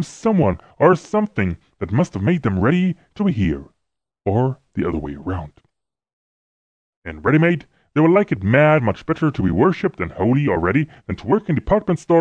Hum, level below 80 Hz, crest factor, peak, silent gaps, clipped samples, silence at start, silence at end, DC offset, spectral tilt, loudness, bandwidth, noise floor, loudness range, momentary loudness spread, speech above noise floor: none; -42 dBFS; 18 dB; -2 dBFS; 6.13-7.02 s; under 0.1%; 0 s; 0 s; under 0.1%; -8 dB/octave; -19 LUFS; 9.2 kHz; -78 dBFS; 8 LU; 12 LU; 60 dB